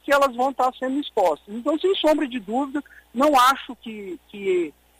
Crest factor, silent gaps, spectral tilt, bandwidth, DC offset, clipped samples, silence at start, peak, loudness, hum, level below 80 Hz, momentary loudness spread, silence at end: 16 dB; none; -3.5 dB/octave; 16 kHz; under 0.1%; under 0.1%; 0.05 s; -8 dBFS; -22 LUFS; none; -58 dBFS; 17 LU; 0.3 s